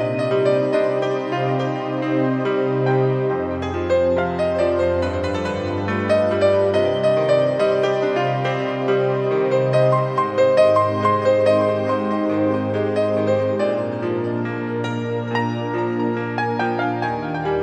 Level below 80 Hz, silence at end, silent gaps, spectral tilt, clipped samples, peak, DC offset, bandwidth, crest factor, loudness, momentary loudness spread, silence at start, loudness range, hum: -50 dBFS; 0 s; none; -7.5 dB/octave; under 0.1%; -4 dBFS; under 0.1%; 8.8 kHz; 16 dB; -20 LUFS; 7 LU; 0 s; 5 LU; none